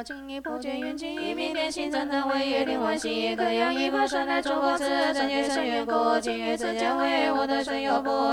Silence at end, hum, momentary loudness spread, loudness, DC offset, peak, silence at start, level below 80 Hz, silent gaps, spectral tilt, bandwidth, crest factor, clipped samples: 0 s; none; 8 LU; -26 LUFS; under 0.1%; -10 dBFS; 0 s; -58 dBFS; none; -3 dB/octave; 16 kHz; 16 dB; under 0.1%